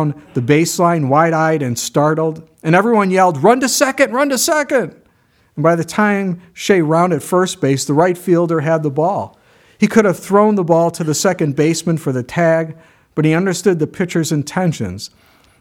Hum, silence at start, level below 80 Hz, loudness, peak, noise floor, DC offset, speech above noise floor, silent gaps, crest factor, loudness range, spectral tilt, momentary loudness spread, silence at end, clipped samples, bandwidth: none; 0 s; -56 dBFS; -15 LUFS; 0 dBFS; -55 dBFS; under 0.1%; 41 dB; none; 14 dB; 3 LU; -5.5 dB/octave; 8 LU; 0.55 s; under 0.1%; 17 kHz